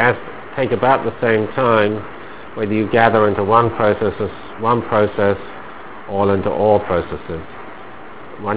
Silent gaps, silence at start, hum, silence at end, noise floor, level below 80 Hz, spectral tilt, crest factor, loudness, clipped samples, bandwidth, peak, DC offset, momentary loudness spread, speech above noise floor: none; 0 s; none; 0 s; -36 dBFS; -42 dBFS; -10.5 dB/octave; 18 dB; -17 LUFS; under 0.1%; 4 kHz; 0 dBFS; 2%; 20 LU; 20 dB